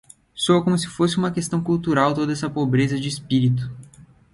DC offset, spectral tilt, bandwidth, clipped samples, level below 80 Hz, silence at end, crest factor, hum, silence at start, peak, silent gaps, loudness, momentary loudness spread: under 0.1%; -6 dB/octave; 11.5 kHz; under 0.1%; -54 dBFS; 0.3 s; 18 dB; none; 0.35 s; -4 dBFS; none; -21 LUFS; 7 LU